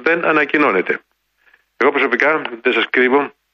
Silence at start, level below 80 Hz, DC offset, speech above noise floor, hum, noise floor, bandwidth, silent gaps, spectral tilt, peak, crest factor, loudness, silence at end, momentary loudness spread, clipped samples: 0 s; -68 dBFS; under 0.1%; 41 dB; none; -56 dBFS; 6.8 kHz; none; -5.5 dB/octave; -2 dBFS; 16 dB; -15 LUFS; 0.25 s; 5 LU; under 0.1%